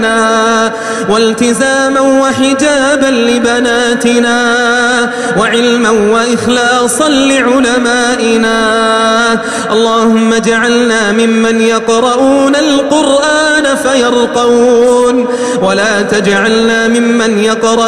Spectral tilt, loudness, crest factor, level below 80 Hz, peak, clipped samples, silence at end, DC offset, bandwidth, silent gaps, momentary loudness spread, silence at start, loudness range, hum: -3 dB/octave; -9 LUFS; 8 dB; -42 dBFS; 0 dBFS; under 0.1%; 0 s; 0.5%; 13 kHz; none; 2 LU; 0 s; 1 LU; none